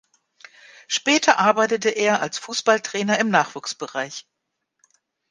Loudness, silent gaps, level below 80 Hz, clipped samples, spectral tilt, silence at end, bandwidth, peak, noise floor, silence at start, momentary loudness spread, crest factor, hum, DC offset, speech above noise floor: -20 LUFS; none; -72 dBFS; under 0.1%; -2.5 dB/octave; 1.1 s; 10 kHz; -2 dBFS; -77 dBFS; 0.9 s; 12 LU; 20 dB; none; under 0.1%; 56 dB